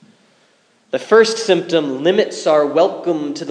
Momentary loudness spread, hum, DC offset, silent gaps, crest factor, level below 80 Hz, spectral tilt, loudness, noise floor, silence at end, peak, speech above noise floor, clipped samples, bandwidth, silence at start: 9 LU; none; under 0.1%; none; 16 dB; -76 dBFS; -4 dB/octave; -16 LUFS; -56 dBFS; 0 s; 0 dBFS; 41 dB; under 0.1%; 10.5 kHz; 0.95 s